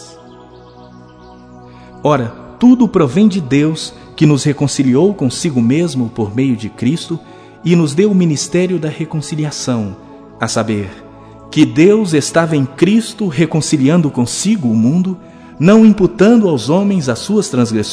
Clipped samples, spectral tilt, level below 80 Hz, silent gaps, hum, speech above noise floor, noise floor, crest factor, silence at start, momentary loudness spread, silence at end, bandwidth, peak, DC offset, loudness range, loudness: 0.2%; -6 dB/octave; -48 dBFS; none; none; 26 dB; -38 dBFS; 14 dB; 0 s; 11 LU; 0 s; 11 kHz; 0 dBFS; under 0.1%; 4 LU; -13 LUFS